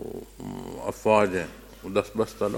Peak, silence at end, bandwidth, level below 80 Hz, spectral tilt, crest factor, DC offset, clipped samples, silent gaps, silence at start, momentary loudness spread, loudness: -6 dBFS; 0 s; 17 kHz; -52 dBFS; -5.5 dB/octave; 22 dB; under 0.1%; under 0.1%; none; 0 s; 17 LU; -26 LUFS